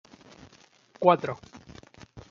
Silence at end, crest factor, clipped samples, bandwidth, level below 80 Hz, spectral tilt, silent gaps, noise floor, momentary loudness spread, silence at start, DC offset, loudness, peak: 0.1 s; 24 dB; under 0.1%; 7.4 kHz; -64 dBFS; -6.5 dB/octave; none; -58 dBFS; 26 LU; 1 s; under 0.1%; -25 LUFS; -6 dBFS